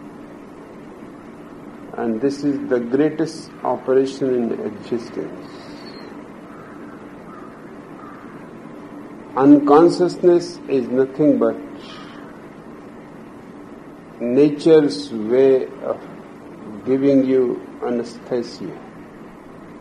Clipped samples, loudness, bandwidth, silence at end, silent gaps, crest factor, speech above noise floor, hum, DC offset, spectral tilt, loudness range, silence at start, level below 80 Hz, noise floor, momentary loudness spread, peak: under 0.1%; -18 LUFS; 11 kHz; 0 s; none; 18 dB; 22 dB; none; under 0.1%; -7 dB/octave; 16 LU; 0 s; -60 dBFS; -39 dBFS; 24 LU; -2 dBFS